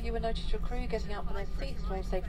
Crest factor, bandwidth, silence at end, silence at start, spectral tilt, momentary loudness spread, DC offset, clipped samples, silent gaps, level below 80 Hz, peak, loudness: 12 dB; 9.8 kHz; 0 s; 0 s; -6.5 dB/octave; 4 LU; under 0.1%; under 0.1%; none; -34 dBFS; -20 dBFS; -37 LUFS